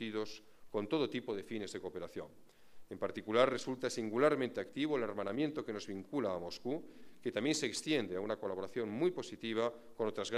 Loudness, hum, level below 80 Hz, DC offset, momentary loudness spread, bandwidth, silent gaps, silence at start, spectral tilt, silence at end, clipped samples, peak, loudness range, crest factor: -38 LUFS; none; -76 dBFS; under 0.1%; 12 LU; 14 kHz; none; 0 s; -4.5 dB/octave; 0 s; under 0.1%; -16 dBFS; 3 LU; 22 dB